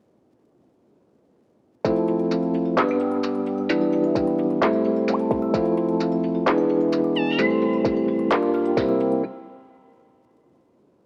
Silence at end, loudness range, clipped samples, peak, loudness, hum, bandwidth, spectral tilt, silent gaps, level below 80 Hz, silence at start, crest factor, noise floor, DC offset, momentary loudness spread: 1.45 s; 4 LU; under 0.1%; -10 dBFS; -22 LUFS; none; 7.2 kHz; -7.5 dB/octave; none; -54 dBFS; 1.85 s; 14 dB; -61 dBFS; under 0.1%; 4 LU